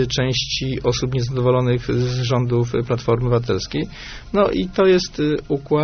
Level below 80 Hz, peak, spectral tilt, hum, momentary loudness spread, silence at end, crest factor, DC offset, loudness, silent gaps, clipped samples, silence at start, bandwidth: -38 dBFS; -4 dBFS; -5.5 dB/octave; none; 6 LU; 0 s; 14 dB; under 0.1%; -20 LUFS; none; under 0.1%; 0 s; 6.6 kHz